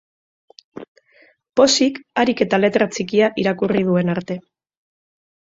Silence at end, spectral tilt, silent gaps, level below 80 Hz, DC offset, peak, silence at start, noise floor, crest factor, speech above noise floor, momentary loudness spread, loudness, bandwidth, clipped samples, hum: 1.15 s; -4.5 dB/octave; 0.88-0.95 s; -58 dBFS; under 0.1%; -2 dBFS; 0.75 s; -55 dBFS; 18 dB; 37 dB; 16 LU; -18 LUFS; 8 kHz; under 0.1%; none